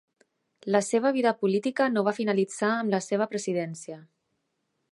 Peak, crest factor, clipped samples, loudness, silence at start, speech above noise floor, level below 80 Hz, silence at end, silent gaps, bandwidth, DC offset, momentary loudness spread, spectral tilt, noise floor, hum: -8 dBFS; 20 dB; under 0.1%; -26 LUFS; 0.65 s; 52 dB; -82 dBFS; 0.9 s; none; 11.5 kHz; under 0.1%; 13 LU; -5 dB/octave; -78 dBFS; none